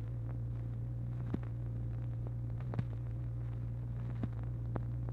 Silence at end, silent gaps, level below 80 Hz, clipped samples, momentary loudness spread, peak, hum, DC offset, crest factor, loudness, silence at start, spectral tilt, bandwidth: 0 s; none; -48 dBFS; under 0.1%; 2 LU; -20 dBFS; none; under 0.1%; 18 dB; -41 LUFS; 0 s; -10.5 dB/octave; 3.8 kHz